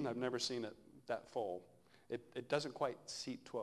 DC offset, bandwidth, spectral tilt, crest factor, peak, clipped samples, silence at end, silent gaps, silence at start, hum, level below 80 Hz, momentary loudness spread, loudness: under 0.1%; 12 kHz; -4 dB/octave; 24 dB; -20 dBFS; under 0.1%; 0 s; none; 0 s; none; -80 dBFS; 10 LU; -43 LUFS